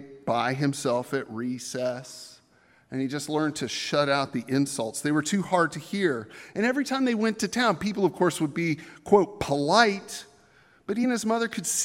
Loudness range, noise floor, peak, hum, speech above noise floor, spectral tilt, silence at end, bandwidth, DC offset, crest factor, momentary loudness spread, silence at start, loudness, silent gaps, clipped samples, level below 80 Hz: 5 LU; -61 dBFS; -2 dBFS; none; 35 dB; -4 dB/octave; 0 s; 16 kHz; under 0.1%; 24 dB; 12 LU; 0 s; -26 LUFS; none; under 0.1%; -62 dBFS